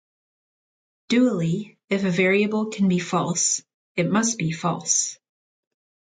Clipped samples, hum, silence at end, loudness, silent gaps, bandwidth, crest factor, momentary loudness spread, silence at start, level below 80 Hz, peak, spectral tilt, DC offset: under 0.1%; none; 1 s; -22 LUFS; 1.84-1.88 s, 3.74-3.95 s; 9.6 kHz; 18 dB; 8 LU; 1.1 s; -66 dBFS; -6 dBFS; -4 dB/octave; under 0.1%